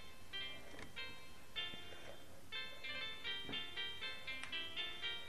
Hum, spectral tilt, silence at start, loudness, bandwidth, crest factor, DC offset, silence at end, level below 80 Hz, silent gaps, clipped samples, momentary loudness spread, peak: none; -2 dB/octave; 0 s; -46 LUFS; 14 kHz; 22 dB; 0.3%; 0 s; -68 dBFS; none; under 0.1%; 10 LU; -28 dBFS